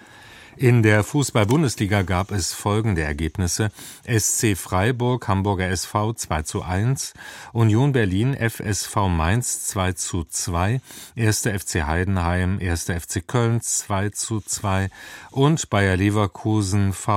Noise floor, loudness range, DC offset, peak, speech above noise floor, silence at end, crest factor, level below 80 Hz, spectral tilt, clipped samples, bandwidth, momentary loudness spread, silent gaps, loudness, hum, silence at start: -45 dBFS; 3 LU; under 0.1%; -2 dBFS; 24 dB; 0 s; 20 dB; -40 dBFS; -5 dB/octave; under 0.1%; 16.5 kHz; 7 LU; none; -22 LUFS; none; 0.25 s